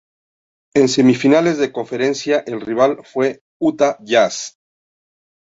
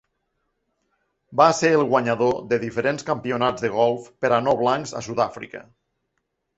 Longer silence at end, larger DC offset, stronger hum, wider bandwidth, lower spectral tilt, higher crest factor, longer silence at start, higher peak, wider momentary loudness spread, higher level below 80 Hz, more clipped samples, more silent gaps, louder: about the same, 0.95 s vs 0.95 s; neither; neither; about the same, 8 kHz vs 8.2 kHz; about the same, -5 dB/octave vs -5 dB/octave; second, 16 dB vs 22 dB; second, 0.75 s vs 1.3 s; about the same, -2 dBFS vs -2 dBFS; about the same, 8 LU vs 9 LU; about the same, -60 dBFS vs -60 dBFS; neither; first, 3.41-3.60 s vs none; first, -17 LUFS vs -21 LUFS